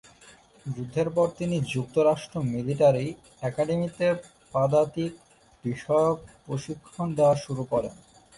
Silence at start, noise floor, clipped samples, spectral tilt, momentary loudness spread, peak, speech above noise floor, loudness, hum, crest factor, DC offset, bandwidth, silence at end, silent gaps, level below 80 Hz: 0.25 s; -54 dBFS; under 0.1%; -7 dB/octave; 13 LU; -10 dBFS; 28 dB; -27 LUFS; none; 18 dB; under 0.1%; 11.5 kHz; 0.45 s; none; -58 dBFS